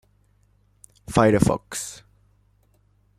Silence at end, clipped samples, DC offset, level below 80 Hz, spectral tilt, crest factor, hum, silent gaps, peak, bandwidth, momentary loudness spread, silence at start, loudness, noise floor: 1.25 s; under 0.1%; under 0.1%; -46 dBFS; -6 dB/octave; 24 dB; 50 Hz at -45 dBFS; none; -2 dBFS; 15.5 kHz; 17 LU; 1.1 s; -22 LUFS; -62 dBFS